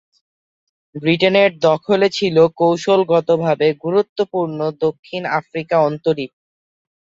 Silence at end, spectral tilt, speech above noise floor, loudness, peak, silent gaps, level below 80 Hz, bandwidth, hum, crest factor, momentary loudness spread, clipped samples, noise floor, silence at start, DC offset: 0.8 s; -6 dB/octave; over 74 dB; -17 LUFS; -2 dBFS; 4.09-4.16 s, 4.99-5.03 s; -60 dBFS; 7.8 kHz; none; 16 dB; 8 LU; under 0.1%; under -90 dBFS; 0.95 s; under 0.1%